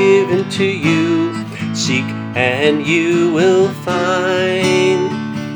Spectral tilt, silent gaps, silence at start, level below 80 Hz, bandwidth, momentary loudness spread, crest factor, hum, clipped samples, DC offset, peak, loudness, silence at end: -5 dB/octave; none; 0 s; -58 dBFS; over 20 kHz; 7 LU; 14 dB; none; under 0.1%; under 0.1%; 0 dBFS; -15 LUFS; 0 s